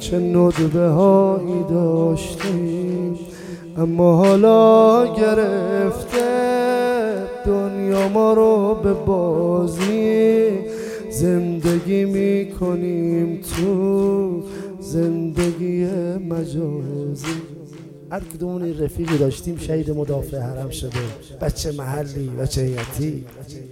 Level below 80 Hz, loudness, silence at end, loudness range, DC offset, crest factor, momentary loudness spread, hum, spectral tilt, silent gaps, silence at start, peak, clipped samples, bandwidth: -40 dBFS; -19 LUFS; 0 s; 10 LU; under 0.1%; 16 dB; 14 LU; none; -7 dB/octave; none; 0 s; -2 dBFS; under 0.1%; 16.5 kHz